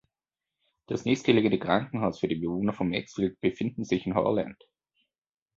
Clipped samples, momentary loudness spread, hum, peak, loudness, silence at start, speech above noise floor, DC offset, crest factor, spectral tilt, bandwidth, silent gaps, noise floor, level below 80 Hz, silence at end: under 0.1%; 8 LU; none; -6 dBFS; -28 LUFS; 0.9 s; over 63 dB; under 0.1%; 22 dB; -6.5 dB/octave; 7.8 kHz; none; under -90 dBFS; -58 dBFS; 1.05 s